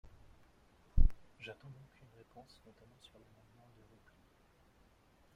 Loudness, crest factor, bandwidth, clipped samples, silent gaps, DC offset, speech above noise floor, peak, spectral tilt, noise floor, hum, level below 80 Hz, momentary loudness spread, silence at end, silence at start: -42 LUFS; 26 dB; 4.7 kHz; under 0.1%; none; under 0.1%; 10 dB; -12 dBFS; -7 dB/octave; -68 dBFS; none; -40 dBFS; 29 LU; 3.85 s; 0.95 s